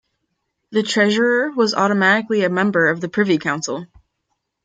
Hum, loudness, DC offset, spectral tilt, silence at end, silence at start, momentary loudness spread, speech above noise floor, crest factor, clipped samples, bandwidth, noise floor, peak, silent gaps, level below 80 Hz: none; -17 LUFS; under 0.1%; -4.5 dB/octave; 0.8 s; 0.7 s; 8 LU; 57 dB; 16 dB; under 0.1%; 9.2 kHz; -74 dBFS; -2 dBFS; none; -62 dBFS